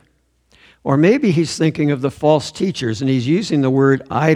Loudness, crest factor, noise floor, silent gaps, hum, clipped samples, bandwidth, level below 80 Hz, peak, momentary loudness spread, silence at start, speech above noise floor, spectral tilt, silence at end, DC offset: -16 LUFS; 16 dB; -60 dBFS; none; none; under 0.1%; 11.5 kHz; -54 dBFS; 0 dBFS; 7 LU; 0.85 s; 44 dB; -6.5 dB/octave; 0 s; under 0.1%